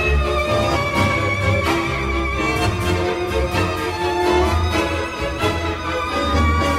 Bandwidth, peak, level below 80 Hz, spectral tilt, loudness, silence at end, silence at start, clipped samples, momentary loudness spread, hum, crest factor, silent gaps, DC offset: 15.5 kHz; -6 dBFS; -26 dBFS; -5.5 dB/octave; -19 LUFS; 0 s; 0 s; under 0.1%; 4 LU; none; 14 dB; none; under 0.1%